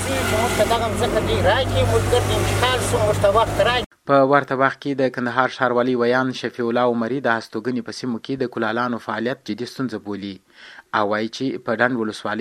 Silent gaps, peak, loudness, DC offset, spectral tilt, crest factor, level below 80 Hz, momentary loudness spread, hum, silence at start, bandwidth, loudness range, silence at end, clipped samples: 3.86-3.91 s; 0 dBFS; -20 LUFS; under 0.1%; -5 dB/octave; 20 dB; -38 dBFS; 9 LU; none; 0 s; 16.5 kHz; 7 LU; 0 s; under 0.1%